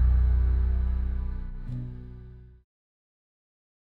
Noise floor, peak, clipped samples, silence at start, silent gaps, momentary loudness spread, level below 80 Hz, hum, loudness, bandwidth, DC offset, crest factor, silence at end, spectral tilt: -46 dBFS; -14 dBFS; under 0.1%; 0 s; none; 21 LU; -28 dBFS; 60 Hz at -55 dBFS; -29 LUFS; 2.4 kHz; under 0.1%; 14 dB; 1.45 s; -10.5 dB/octave